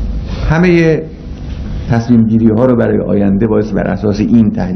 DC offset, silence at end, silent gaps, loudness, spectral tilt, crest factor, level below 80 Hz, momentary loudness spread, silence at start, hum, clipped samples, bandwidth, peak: under 0.1%; 0 s; none; -11 LUFS; -8.5 dB/octave; 12 dB; -24 dBFS; 14 LU; 0 s; none; 0.4%; 6.4 kHz; 0 dBFS